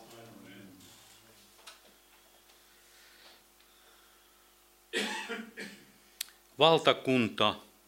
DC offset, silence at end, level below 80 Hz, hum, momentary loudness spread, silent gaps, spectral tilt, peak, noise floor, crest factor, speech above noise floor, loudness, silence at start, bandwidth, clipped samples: under 0.1%; 0.25 s; -76 dBFS; 50 Hz at -75 dBFS; 28 LU; none; -4 dB/octave; -6 dBFS; -63 dBFS; 28 dB; 36 dB; -30 LUFS; 0.1 s; 16 kHz; under 0.1%